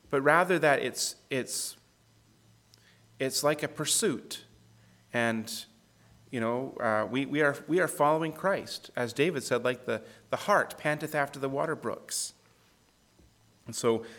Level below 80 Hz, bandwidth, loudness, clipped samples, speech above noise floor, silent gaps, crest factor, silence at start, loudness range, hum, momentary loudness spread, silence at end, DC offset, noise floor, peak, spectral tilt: -72 dBFS; 19 kHz; -30 LUFS; under 0.1%; 36 dB; none; 22 dB; 0.1 s; 4 LU; none; 12 LU; 0 s; under 0.1%; -65 dBFS; -8 dBFS; -3.5 dB/octave